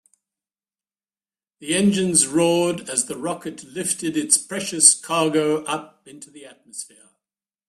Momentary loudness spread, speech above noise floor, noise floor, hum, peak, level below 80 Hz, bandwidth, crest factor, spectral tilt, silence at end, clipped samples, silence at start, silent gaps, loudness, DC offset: 21 LU; over 68 dB; under -90 dBFS; none; 0 dBFS; -64 dBFS; 15.5 kHz; 24 dB; -3 dB/octave; 0.85 s; under 0.1%; 1.6 s; none; -19 LUFS; under 0.1%